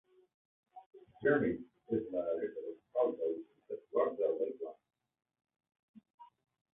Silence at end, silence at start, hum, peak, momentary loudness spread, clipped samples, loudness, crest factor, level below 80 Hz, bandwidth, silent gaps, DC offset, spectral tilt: 0.5 s; 0.75 s; none; -18 dBFS; 14 LU; under 0.1%; -36 LUFS; 20 dB; -74 dBFS; 3.8 kHz; 0.86-0.91 s, 5.79-5.94 s, 6.14-6.18 s; under 0.1%; -2.5 dB/octave